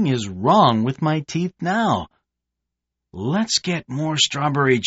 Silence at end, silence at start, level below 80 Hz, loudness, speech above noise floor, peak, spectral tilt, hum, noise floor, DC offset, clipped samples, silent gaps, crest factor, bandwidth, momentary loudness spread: 0 s; 0 s; -56 dBFS; -20 LUFS; 62 dB; -4 dBFS; -4 dB/octave; 60 Hz at -45 dBFS; -82 dBFS; under 0.1%; under 0.1%; none; 18 dB; 8 kHz; 10 LU